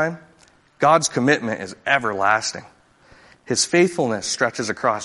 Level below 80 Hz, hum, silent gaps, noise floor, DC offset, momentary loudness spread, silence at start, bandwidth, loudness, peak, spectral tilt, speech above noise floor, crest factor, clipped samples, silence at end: -60 dBFS; none; none; -55 dBFS; under 0.1%; 11 LU; 0 s; 11.5 kHz; -20 LUFS; -2 dBFS; -3.5 dB/octave; 35 dB; 20 dB; under 0.1%; 0 s